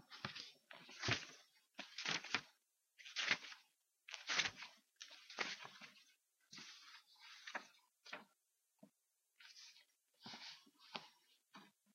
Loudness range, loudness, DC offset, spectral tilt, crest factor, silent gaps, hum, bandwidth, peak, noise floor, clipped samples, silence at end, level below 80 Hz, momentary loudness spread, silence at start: 14 LU; -46 LUFS; under 0.1%; -1.5 dB/octave; 32 dB; none; none; 15.5 kHz; -18 dBFS; -86 dBFS; under 0.1%; 0.25 s; -82 dBFS; 24 LU; 0 s